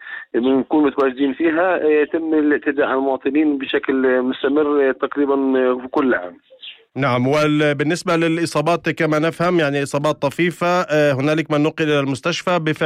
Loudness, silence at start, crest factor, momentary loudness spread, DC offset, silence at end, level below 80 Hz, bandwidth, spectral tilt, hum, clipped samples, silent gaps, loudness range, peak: -18 LUFS; 0 s; 10 dB; 4 LU; under 0.1%; 0 s; -58 dBFS; 13 kHz; -6 dB/octave; none; under 0.1%; none; 1 LU; -6 dBFS